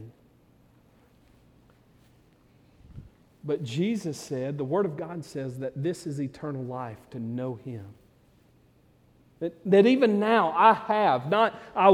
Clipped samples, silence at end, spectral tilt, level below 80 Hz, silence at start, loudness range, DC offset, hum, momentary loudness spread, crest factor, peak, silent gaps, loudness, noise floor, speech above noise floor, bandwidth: under 0.1%; 0 s; -6.5 dB/octave; -64 dBFS; 0 s; 14 LU; under 0.1%; none; 16 LU; 24 dB; -4 dBFS; none; -26 LUFS; -61 dBFS; 35 dB; 13 kHz